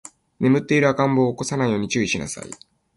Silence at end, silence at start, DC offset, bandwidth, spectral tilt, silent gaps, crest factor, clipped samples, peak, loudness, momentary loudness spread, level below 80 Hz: 0.4 s; 0.4 s; under 0.1%; 11.5 kHz; -5.5 dB/octave; none; 16 dB; under 0.1%; -4 dBFS; -21 LUFS; 15 LU; -54 dBFS